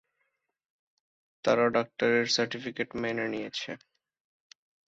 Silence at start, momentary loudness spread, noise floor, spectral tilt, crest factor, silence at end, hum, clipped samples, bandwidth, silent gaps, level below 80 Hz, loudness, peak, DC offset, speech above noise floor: 1.45 s; 11 LU; -79 dBFS; -3.5 dB/octave; 20 dB; 1.1 s; none; under 0.1%; 8 kHz; none; -70 dBFS; -29 LUFS; -12 dBFS; under 0.1%; 50 dB